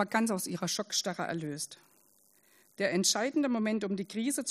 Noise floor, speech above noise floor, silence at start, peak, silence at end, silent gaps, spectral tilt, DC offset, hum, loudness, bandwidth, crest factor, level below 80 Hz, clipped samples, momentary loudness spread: -66 dBFS; 34 dB; 0 s; -14 dBFS; 0 s; none; -3 dB/octave; under 0.1%; none; -32 LUFS; 15.5 kHz; 20 dB; -78 dBFS; under 0.1%; 9 LU